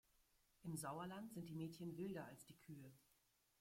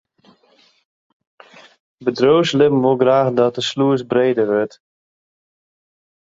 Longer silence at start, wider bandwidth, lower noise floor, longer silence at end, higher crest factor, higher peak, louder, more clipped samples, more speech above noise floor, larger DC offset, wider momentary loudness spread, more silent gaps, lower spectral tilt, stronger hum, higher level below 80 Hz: second, 0.6 s vs 2 s; first, 16.5 kHz vs 7.8 kHz; first, -82 dBFS vs -56 dBFS; second, 0.6 s vs 1.6 s; about the same, 16 dB vs 18 dB; second, -38 dBFS vs 0 dBFS; second, -53 LUFS vs -16 LUFS; neither; second, 29 dB vs 41 dB; neither; first, 11 LU vs 7 LU; neither; about the same, -5.5 dB/octave vs -6 dB/octave; neither; second, -82 dBFS vs -60 dBFS